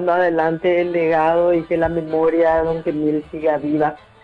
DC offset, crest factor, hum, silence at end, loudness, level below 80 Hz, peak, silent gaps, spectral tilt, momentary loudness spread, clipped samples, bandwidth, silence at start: under 0.1%; 12 dB; none; 0.25 s; -18 LUFS; -46 dBFS; -6 dBFS; none; -8.5 dB/octave; 5 LU; under 0.1%; 5.2 kHz; 0 s